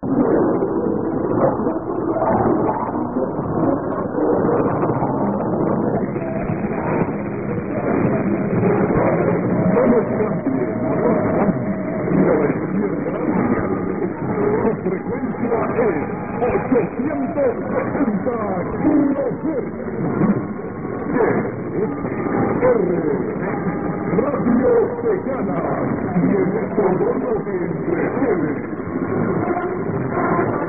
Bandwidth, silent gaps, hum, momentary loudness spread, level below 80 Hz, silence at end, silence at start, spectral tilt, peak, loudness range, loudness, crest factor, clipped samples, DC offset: 2.9 kHz; none; none; 6 LU; -44 dBFS; 0 s; 0 s; -15 dB/octave; -4 dBFS; 3 LU; -20 LUFS; 14 dB; under 0.1%; 0.5%